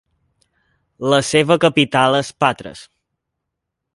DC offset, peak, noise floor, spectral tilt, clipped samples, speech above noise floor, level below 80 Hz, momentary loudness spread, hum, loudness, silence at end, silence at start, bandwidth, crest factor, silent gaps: under 0.1%; 0 dBFS; -79 dBFS; -4.5 dB/octave; under 0.1%; 63 dB; -56 dBFS; 12 LU; none; -16 LUFS; 1.15 s; 1 s; 11.5 kHz; 18 dB; none